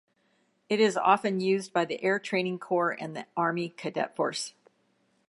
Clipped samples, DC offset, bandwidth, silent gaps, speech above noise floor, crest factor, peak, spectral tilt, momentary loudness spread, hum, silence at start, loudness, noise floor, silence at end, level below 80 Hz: under 0.1%; under 0.1%; 11.5 kHz; none; 43 dB; 20 dB; -10 dBFS; -4.5 dB/octave; 10 LU; none; 0.7 s; -28 LUFS; -70 dBFS; 0.8 s; -82 dBFS